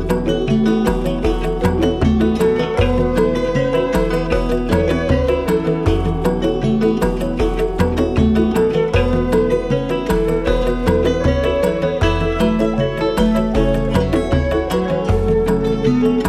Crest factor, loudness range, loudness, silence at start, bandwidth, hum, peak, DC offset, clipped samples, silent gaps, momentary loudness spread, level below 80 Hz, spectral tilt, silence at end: 14 dB; 1 LU; -17 LUFS; 0 s; 16 kHz; none; -2 dBFS; under 0.1%; under 0.1%; none; 3 LU; -24 dBFS; -7 dB/octave; 0 s